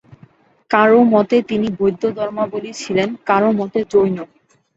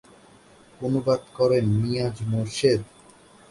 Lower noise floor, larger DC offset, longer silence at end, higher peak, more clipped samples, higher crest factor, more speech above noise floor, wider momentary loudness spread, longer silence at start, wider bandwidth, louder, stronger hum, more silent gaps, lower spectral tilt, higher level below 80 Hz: about the same, -49 dBFS vs -52 dBFS; neither; second, 0.5 s vs 0.65 s; first, -2 dBFS vs -8 dBFS; neither; about the same, 16 dB vs 18 dB; first, 34 dB vs 30 dB; first, 11 LU vs 6 LU; about the same, 0.7 s vs 0.8 s; second, 8 kHz vs 11.5 kHz; first, -16 LUFS vs -24 LUFS; neither; neither; about the same, -6 dB/octave vs -6.5 dB/octave; about the same, -56 dBFS vs -52 dBFS